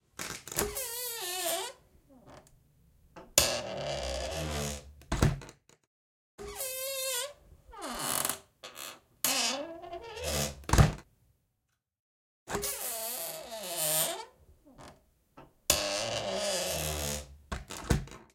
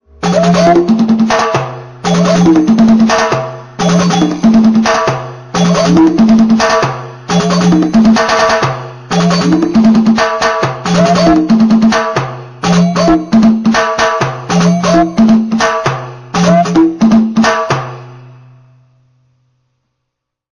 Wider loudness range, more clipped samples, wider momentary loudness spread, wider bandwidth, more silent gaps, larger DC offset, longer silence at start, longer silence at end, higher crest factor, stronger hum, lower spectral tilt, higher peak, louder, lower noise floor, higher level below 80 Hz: about the same, 4 LU vs 3 LU; neither; first, 16 LU vs 9 LU; first, 17 kHz vs 10.5 kHz; first, 5.87-6.38 s, 12.00-12.46 s vs none; neither; about the same, 0.2 s vs 0.2 s; second, 0.1 s vs 2.3 s; first, 32 dB vs 10 dB; neither; second, -3 dB/octave vs -6 dB/octave; second, -4 dBFS vs 0 dBFS; second, -32 LUFS vs -10 LUFS; first, -81 dBFS vs -74 dBFS; second, -44 dBFS vs -38 dBFS